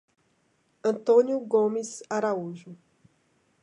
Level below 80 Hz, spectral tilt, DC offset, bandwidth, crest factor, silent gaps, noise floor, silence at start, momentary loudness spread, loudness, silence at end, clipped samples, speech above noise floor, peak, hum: -82 dBFS; -5.5 dB/octave; under 0.1%; 11 kHz; 18 dB; none; -69 dBFS; 0.85 s; 12 LU; -26 LUFS; 0.9 s; under 0.1%; 44 dB; -10 dBFS; none